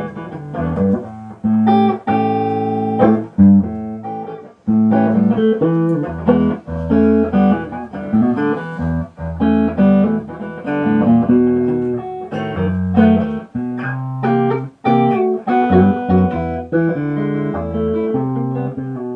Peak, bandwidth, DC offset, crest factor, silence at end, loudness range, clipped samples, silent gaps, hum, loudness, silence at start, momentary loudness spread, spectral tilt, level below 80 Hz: 0 dBFS; 5.2 kHz; under 0.1%; 16 dB; 0 s; 2 LU; under 0.1%; none; none; -16 LUFS; 0 s; 11 LU; -10.5 dB/octave; -40 dBFS